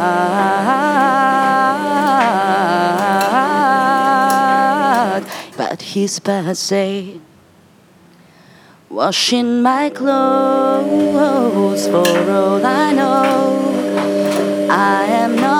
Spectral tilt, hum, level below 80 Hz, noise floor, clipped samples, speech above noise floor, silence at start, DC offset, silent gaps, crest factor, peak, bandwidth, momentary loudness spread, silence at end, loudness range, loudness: -4.5 dB/octave; none; -68 dBFS; -48 dBFS; under 0.1%; 33 dB; 0 s; under 0.1%; none; 14 dB; 0 dBFS; 17.5 kHz; 6 LU; 0 s; 7 LU; -14 LUFS